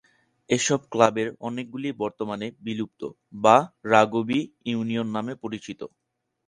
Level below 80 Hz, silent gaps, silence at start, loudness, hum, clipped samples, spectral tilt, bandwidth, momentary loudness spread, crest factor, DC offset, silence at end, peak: -66 dBFS; none; 0.5 s; -25 LUFS; none; under 0.1%; -4.5 dB/octave; 11 kHz; 15 LU; 24 dB; under 0.1%; 0.6 s; -2 dBFS